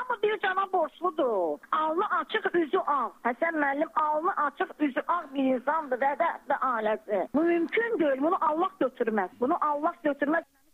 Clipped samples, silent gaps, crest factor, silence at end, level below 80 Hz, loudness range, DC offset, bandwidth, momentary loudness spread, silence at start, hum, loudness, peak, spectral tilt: under 0.1%; none; 16 dB; 0.3 s; -74 dBFS; 1 LU; under 0.1%; 15 kHz; 3 LU; 0 s; none; -28 LUFS; -12 dBFS; -6 dB/octave